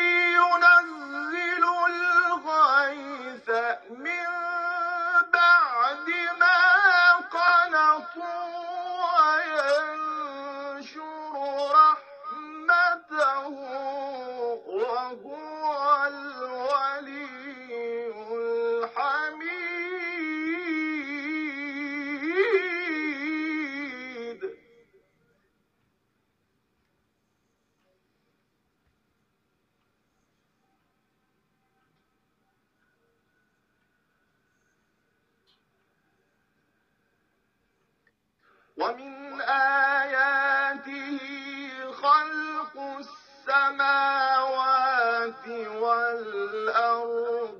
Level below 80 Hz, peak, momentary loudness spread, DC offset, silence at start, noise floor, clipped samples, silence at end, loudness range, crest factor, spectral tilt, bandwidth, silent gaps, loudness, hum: -82 dBFS; -6 dBFS; 17 LU; under 0.1%; 0 s; -74 dBFS; under 0.1%; 0 s; 9 LU; 22 dB; -2.5 dB/octave; 8.6 kHz; none; -24 LUFS; none